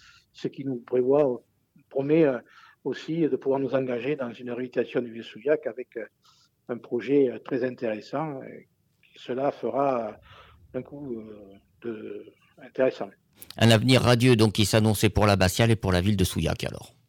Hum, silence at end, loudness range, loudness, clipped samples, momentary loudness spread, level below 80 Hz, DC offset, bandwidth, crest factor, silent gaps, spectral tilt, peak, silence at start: none; 0.2 s; 11 LU; -25 LUFS; under 0.1%; 18 LU; -48 dBFS; under 0.1%; 18.5 kHz; 16 dB; none; -5.5 dB/octave; -10 dBFS; 0.4 s